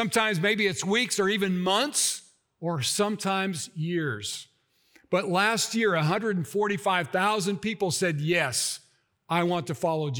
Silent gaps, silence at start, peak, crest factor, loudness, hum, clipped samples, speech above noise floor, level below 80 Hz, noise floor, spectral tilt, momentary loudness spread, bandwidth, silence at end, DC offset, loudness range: none; 0 s; -8 dBFS; 18 dB; -26 LUFS; none; under 0.1%; 36 dB; -70 dBFS; -63 dBFS; -3.5 dB/octave; 7 LU; over 20 kHz; 0 s; under 0.1%; 3 LU